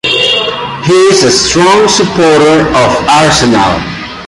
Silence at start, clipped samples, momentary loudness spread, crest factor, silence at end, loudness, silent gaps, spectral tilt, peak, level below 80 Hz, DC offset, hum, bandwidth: 0.05 s; under 0.1%; 6 LU; 8 dB; 0 s; -7 LUFS; none; -3.5 dB/octave; 0 dBFS; -32 dBFS; under 0.1%; none; 11.5 kHz